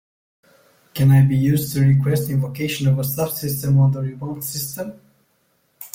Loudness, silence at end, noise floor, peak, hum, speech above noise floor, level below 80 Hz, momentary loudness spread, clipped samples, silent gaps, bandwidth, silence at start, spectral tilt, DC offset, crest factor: -19 LUFS; 0.1 s; -64 dBFS; -6 dBFS; none; 46 dB; -52 dBFS; 13 LU; under 0.1%; none; 16.5 kHz; 0.95 s; -6.5 dB/octave; under 0.1%; 14 dB